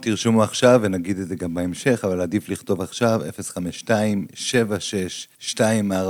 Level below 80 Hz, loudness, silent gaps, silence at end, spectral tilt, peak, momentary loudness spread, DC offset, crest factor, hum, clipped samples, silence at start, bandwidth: -58 dBFS; -22 LUFS; none; 0 s; -5 dB/octave; -2 dBFS; 12 LU; under 0.1%; 18 dB; none; under 0.1%; 0 s; 19.5 kHz